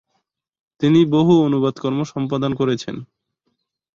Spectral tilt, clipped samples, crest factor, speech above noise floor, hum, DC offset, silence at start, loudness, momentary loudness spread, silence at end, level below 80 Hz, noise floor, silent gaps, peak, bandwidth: -7.5 dB/octave; under 0.1%; 16 dB; 55 dB; none; under 0.1%; 0.8 s; -18 LUFS; 10 LU; 0.9 s; -56 dBFS; -73 dBFS; none; -4 dBFS; 7.4 kHz